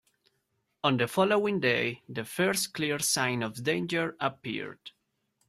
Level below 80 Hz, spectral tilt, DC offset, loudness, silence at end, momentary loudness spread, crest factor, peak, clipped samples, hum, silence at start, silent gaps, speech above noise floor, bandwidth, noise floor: -70 dBFS; -3.5 dB/octave; under 0.1%; -29 LUFS; 0.6 s; 11 LU; 20 dB; -10 dBFS; under 0.1%; none; 0.85 s; none; 48 dB; 16 kHz; -77 dBFS